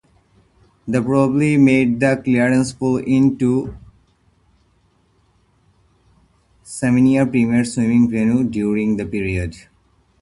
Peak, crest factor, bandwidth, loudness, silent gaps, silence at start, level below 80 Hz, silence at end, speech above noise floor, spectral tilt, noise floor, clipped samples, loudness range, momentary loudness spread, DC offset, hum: -2 dBFS; 18 dB; 11.5 kHz; -17 LUFS; none; 0.85 s; -44 dBFS; 0.65 s; 43 dB; -7 dB/octave; -59 dBFS; under 0.1%; 7 LU; 9 LU; under 0.1%; none